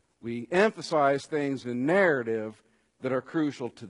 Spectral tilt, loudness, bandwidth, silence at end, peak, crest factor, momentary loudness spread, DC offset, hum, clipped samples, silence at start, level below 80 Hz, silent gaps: -6 dB/octave; -27 LUFS; 11 kHz; 0 s; -10 dBFS; 18 dB; 13 LU; under 0.1%; none; under 0.1%; 0.25 s; -72 dBFS; none